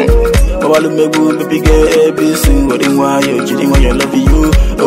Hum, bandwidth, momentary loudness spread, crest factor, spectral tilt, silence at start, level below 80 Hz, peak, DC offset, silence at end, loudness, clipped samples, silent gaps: none; 16.5 kHz; 3 LU; 8 dB; -5.5 dB/octave; 0 s; -14 dBFS; 0 dBFS; under 0.1%; 0 s; -10 LUFS; under 0.1%; none